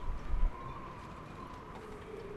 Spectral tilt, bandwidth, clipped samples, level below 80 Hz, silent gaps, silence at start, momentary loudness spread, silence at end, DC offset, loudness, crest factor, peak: -7 dB/octave; 8 kHz; under 0.1%; -38 dBFS; none; 0 s; 8 LU; 0 s; under 0.1%; -44 LUFS; 18 dB; -20 dBFS